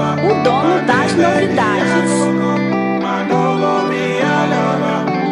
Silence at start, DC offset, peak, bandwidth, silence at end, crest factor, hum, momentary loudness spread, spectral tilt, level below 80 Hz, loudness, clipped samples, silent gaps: 0 s; under 0.1%; 0 dBFS; 11 kHz; 0 s; 14 dB; none; 4 LU; -6 dB/octave; -56 dBFS; -15 LUFS; under 0.1%; none